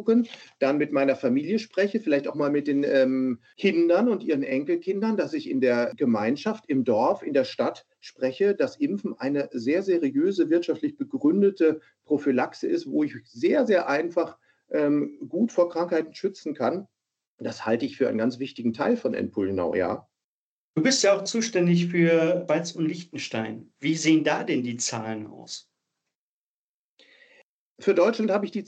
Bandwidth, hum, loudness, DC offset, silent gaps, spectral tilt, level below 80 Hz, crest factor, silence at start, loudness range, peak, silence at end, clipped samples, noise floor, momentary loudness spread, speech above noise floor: 9 kHz; none; -25 LUFS; under 0.1%; 17.27-17.38 s, 20.24-20.74 s, 26.15-26.97 s, 27.43-27.76 s; -5.5 dB/octave; -78 dBFS; 16 dB; 0 s; 4 LU; -8 dBFS; 0.05 s; under 0.1%; under -90 dBFS; 9 LU; over 66 dB